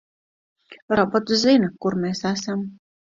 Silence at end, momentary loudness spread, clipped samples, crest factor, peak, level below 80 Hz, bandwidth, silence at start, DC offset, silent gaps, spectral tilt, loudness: 0.35 s; 11 LU; under 0.1%; 18 dB; -4 dBFS; -58 dBFS; 7.6 kHz; 0.7 s; under 0.1%; 0.82-0.88 s; -5 dB/octave; -21 LUFS